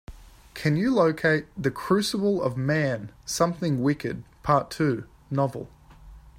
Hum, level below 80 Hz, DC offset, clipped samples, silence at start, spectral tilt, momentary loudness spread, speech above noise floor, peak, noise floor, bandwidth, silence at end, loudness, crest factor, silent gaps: none; -52 dBFS; under 0.1%; under 0.1%; 0.1 s; -6 dB/octave; 11 LU; 23 dB; -8 dBFS; -48 dBFS; 16 kHz; 0.2 s; -25 LUFS; 18 dB; none